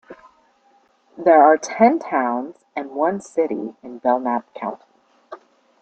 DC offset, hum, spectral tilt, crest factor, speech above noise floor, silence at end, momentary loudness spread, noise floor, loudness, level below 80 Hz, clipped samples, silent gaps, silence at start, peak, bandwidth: under 0.1%; none; -5.5 dB/octave; 20 dB; 40 dB; 0.45 s; 18 LU; -59 dBFS; -19 LUFS; -70 dBFS; under 0.1%; none; 0.1 s; -2 dBFS; 8.8 kHz